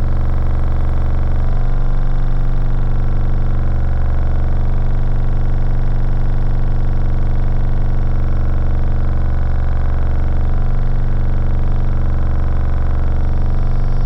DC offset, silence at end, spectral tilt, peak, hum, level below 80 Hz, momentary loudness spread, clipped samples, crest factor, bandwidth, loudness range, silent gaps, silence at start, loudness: under 0.1%; 0 s; -9.5 dB/octave; -4 dBFS; none; -14 dBFS; 1 LU; under 0.1%; 8 dB; 3.6 kHz; 0 LU; none; 0 s; -20 LUFS